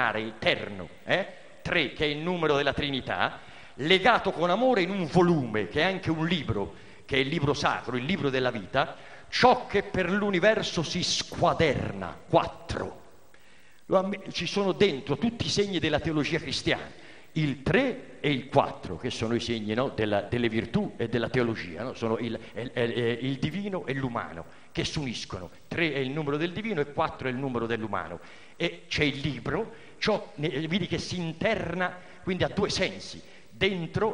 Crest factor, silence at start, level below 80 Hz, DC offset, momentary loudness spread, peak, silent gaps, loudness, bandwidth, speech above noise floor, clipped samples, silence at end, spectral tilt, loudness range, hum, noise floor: 22 dB; 0 s; -52 dBFS; 0.3%; 11 LU; -6 dBFS; none; -28 LUFS; 10.5 kHz; 31 dB; under 0.1%; 0 s; -5 dB/octave; 5 LU; none; -58 dBFS